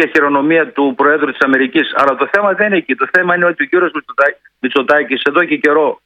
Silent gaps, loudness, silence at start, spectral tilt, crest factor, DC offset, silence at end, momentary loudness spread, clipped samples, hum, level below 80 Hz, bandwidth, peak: none; -13 LUFS; 0 s; -6 dB/octave; 12 dB; under 0.1%; 0.1 s; 3 LU; 0.1%; none; -62 dBFS; 9.4 kHz; 0 dBFS